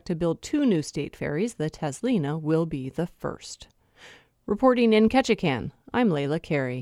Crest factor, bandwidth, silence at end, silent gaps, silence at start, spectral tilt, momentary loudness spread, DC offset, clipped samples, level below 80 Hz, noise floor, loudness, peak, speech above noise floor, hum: 18 dB; 13 kHz; 0 s; none; 0.05 s; -6 dB/octave; 13 LU; under 0.1%; under 0.1%; -54 dBFS; -52 dBFS; -25 LUFS; -6 dBFS; 27 dB; none